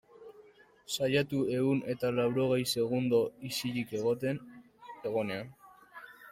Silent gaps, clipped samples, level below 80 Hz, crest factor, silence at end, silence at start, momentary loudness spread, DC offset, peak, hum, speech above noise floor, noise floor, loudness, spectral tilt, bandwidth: none; under 0.1%; -68 dBFS; 18 dB; 0 s; 0.2 s; 20 LU; under 0.1%; -16 dBFS; none; 28 dB; -59 dBFS; -32 LUFS; -5.5 dB/octave; 16 kHz